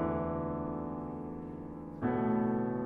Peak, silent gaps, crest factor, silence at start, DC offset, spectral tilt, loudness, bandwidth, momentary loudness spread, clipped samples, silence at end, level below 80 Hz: -20 dBFS; none; 14 dB; 0 s; under 0.1%; -11 dB/octave; -36 LUFS; 3.6 kHz; 12 LU; under 0.1%; 0 s; -54 dBFS